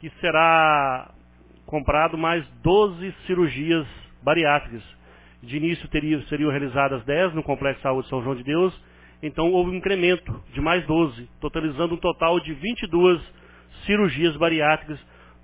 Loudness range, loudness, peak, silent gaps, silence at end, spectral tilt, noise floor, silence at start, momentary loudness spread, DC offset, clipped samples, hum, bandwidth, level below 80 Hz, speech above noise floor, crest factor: 3 LU; -22 LUFS; -4 dBFS; none; 0.45 s; -10 dB/octave; -51 dBFS; 0 s; 12 LU; under 0.1%; under 0.1%; 60 Hz at -50 dBFS; 4 kHz; -42 dBFS; 29 dB; 20 dB